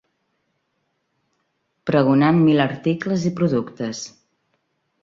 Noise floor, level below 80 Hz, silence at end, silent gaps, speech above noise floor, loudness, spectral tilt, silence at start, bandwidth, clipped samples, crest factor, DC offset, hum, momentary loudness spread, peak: -72 dBFS; -60 dBFS; 0.95 s; none; 53 dB; -19 LUFS; -7 dB/octave; 1.85 s; 7.6 kHz; under 0.1%; 20 dB; under 0.1%; none; 14 LU; -2 dBFS